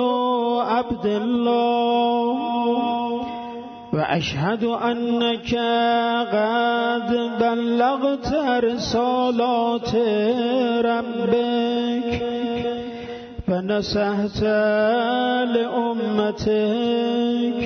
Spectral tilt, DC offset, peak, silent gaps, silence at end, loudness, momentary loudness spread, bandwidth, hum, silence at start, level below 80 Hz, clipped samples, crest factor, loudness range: -6 dB/octave; under 0.1%; -6 dBFS; none; 0 s; -21 LUFS; 5 LU; 6.6 kHz; none; 0 s; -48 dBFS; under 0.1%; 14 dB; 3 LU